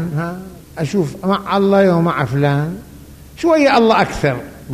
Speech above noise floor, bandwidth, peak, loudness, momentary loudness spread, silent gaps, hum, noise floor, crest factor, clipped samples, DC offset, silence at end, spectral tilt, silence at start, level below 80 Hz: 23 dB; 15 kHz; -2 dBFS; -15 LUFS; 14 LU; none; none; -38 dBFS; 14 dB; under 0.1%; under 0.1%; 0 s; -7 dB/octave; 0 s; -42 dBFS